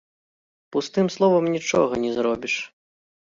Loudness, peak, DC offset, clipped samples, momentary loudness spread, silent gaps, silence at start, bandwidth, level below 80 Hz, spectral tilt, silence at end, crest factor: -22 LUFS; -6 dBFS; under 0.1%; under 0.1%; 9 LU; none; 0.7 s; 7.6 kHz; -62 dBFS; -5 dB/octave; 0.65 s; 18 dB